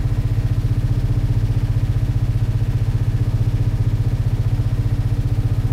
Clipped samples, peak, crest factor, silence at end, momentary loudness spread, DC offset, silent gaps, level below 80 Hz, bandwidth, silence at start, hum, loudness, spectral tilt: under 0.1%; -8 dBFS; 10 dB; 0 s; 1 LU; under 0.1%; none; -24 dBFS; 9.6 kHz; 0 s; none; -20 LUFS; -8.5 dB/octave